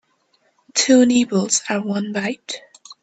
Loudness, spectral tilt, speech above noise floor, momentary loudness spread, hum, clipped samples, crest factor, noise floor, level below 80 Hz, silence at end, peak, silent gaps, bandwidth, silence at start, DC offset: -18 LUFS; -3.5 dB/octave; 45 dB; 16 LU; none; under 0.1%; 18 dB; -63 dBFS; -64 dBFS; 0.1 s; -2 dBFS; none; 9.2 kHz; 0.75 s; under 0.1%